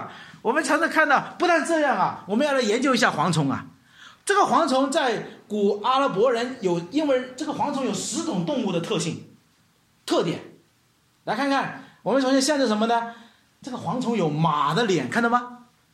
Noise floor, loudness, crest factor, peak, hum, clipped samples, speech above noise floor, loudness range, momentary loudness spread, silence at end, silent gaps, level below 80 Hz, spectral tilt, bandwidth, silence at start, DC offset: -63 dBFS; -23 LUFS; 20 dB; -4 dBFS; none; under 0.1%; 41 dB; 6 LU; 12 LU; 0.35 s; none; -70 dBFS; -4.5 dB/octave; 15 kHz; 0 s; under 0.1%